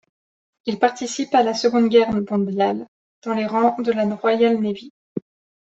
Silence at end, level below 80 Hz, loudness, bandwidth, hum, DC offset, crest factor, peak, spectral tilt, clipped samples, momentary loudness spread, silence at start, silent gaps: 0.45 s; -60 dBFS; -20 LUFS; 8.2 kHz; none; under 0.1%; 18 dB; -2 dBFS; -5.5 dB/octave; under 0.1%; 17 LU; 0.65 s; 2.88-3.22 s, 4.90-5.16 s